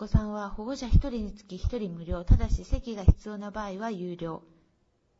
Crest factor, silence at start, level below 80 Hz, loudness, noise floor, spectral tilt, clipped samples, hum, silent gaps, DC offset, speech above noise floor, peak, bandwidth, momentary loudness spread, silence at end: 22 dB; 0 s; -30 dBFS; -30 LUFS; -70 dBFS; -8 dB/octave; under 0.1%; none; none; under 0.1%; 43 dB; -4 dBFS; 7.6 kHz; 11 LU; 0.8 s